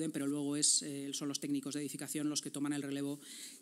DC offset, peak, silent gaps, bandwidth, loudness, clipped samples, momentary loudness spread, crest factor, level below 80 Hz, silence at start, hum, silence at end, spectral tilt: under 0.1%; -18 dBFS; none; 16 kHz; -36 LUFS; under 0.1%; 11 LU; 20 dB; under -90 dBFS; 0 s; none; 0 s; -3 dB/octave